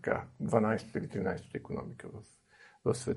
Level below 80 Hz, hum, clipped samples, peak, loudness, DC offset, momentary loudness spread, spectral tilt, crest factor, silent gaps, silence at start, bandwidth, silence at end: -64 dBFS; none; under 0.1%; -10 dBFS; -35 LUFS; under 0.1%; 17 LU; -6.5 dB/octave; 24 dB; none; 0.05 s; 11.5 kHz; 0 s